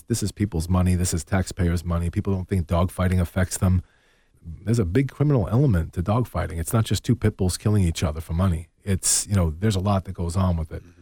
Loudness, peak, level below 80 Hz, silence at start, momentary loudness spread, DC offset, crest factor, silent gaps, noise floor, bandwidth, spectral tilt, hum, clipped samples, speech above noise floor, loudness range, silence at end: -23 LUFS; -8 dBFS; -36 dBFS; 0.1 s; 6 LU; under 0.1%; 16 dB; none; -59 dBFS; 18 kHz; -5.5 dB/octave; none; under 0.1%; 36 dB; 2 LU; 0.2 s